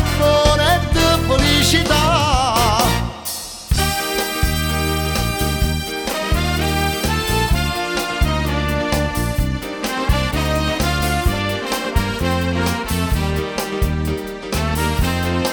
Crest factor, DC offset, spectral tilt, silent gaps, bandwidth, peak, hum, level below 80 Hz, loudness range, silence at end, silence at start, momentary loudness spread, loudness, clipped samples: 18 dB; under 0.1%; -4.5 dB/octave; none; 19.5 kHz; 0 dBFS; none; -24 dBFS; 4 LU; 0 s; 0 s; 8 LU; -18 LUFS; under 0.1%